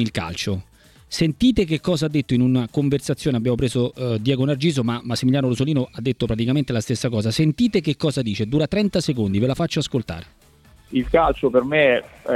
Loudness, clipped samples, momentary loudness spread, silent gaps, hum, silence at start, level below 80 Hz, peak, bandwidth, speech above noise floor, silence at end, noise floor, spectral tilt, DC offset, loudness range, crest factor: -21 LUFS; under 0.1%; 7 LU; none; none; 0 s; -42 dBFS; -2 dBFS; 14 kHz; 31 dB; 0 s; -51 dBFS; -6 dB/octave; under 0.1%; 1 LU; 18 dB